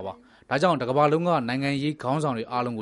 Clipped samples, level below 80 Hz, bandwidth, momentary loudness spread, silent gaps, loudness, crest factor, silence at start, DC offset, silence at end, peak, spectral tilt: under 0.1%; -64 dBFS; 11.5 kHz; 7 LU; none; -25 LUFS; 18 dB; 0 s; under 0.1%; 0 s; -8 dBFS; -6.5 dB/octave